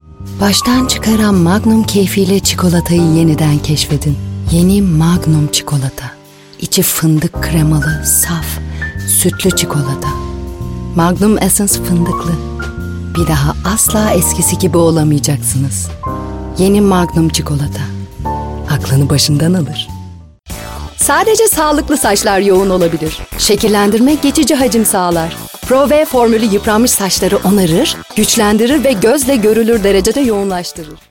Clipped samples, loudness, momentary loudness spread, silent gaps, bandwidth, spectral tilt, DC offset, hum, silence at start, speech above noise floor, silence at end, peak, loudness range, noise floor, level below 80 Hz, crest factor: under 0.1%; -11 LUFS; 11 LU; none; 17 kHz; -4.5 dB/octave; under 0.1%; none; 0.1 s; 20 dB; 0.15 s; 0 dBFS; 3 LU; -31 dBFS; -28 dBFS; 12 dB